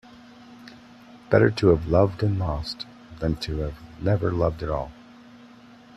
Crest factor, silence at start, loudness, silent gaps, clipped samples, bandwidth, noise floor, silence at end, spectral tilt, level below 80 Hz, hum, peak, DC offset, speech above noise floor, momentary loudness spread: 20 dB; 0.4 s; -24 LUFS; none; under 0.1%; 11.5 kHz; -49 dBFS; 0.5 s; -7.5 dB/octave; -42 dBFS; none; -4 dBFS; under 0.1%; 26 dB; 20 LU